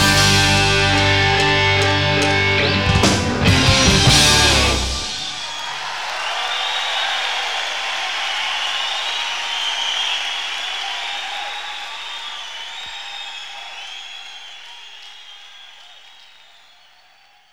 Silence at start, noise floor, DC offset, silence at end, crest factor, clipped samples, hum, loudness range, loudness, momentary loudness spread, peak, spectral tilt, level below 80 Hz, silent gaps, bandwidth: 0 s; -52 dBFS; 0.9%; 0 s; 18 dB; under 0.1%; none; 18 LU; -16 LUFS; 18 LU; 0 dBFS; -3 dB/octave; -34 dBFS; none; 18 kHz